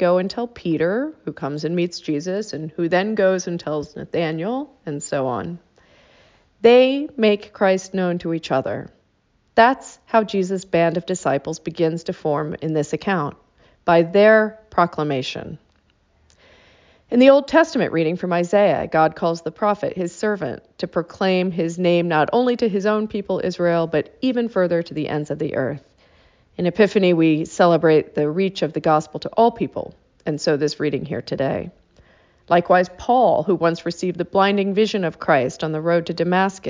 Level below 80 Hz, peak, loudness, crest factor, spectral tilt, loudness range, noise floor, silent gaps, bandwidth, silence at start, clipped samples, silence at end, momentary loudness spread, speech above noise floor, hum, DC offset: -56 dBFS; -2 dBFS; -20 LUFS; 18 dB; -6 dB/octave; 4 LU; -63 dBFS; none; 7.6 kHz; 0 s; under 0.1%; 0 s; 11 LU; 44 dB; none; under 0.1%